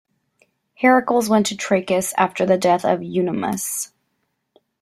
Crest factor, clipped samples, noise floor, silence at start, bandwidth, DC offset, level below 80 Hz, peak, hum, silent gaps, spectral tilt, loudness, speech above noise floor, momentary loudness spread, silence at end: 18 dB; under 0.1%; -72 dBFS; 0.8 s; 16 kHz; under 0.1%; -62 dBFS; -2 dBFS; none; none; -4.5 dB/octave; -19 LUFS; 54 dB; 7 LU; 0.95 s